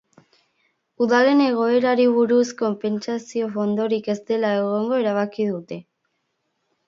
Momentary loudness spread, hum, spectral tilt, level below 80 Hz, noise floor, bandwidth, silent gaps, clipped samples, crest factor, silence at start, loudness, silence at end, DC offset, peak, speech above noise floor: 9 LU; none; -6 dB/octave; -74 dBFS; -73 dBFS; 7.6 kHz; none; under 0.1%; 18 dB; 1 s; -21 LUFS; 1.05 s; under 0.1%; -4 dBFS; 53 dB